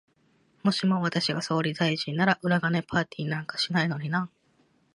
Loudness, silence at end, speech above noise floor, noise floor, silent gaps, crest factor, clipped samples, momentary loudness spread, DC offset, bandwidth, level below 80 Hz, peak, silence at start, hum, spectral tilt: -27 LUFS; 0.65 s; 39 dB; -66 dBFS; none; 20 dB; under 0.1%; 6 LU; under 0.1%; 11.5 kHz; -64 dBFS; -8 dBFS; 0.65 s; none; -5.5 dB/octave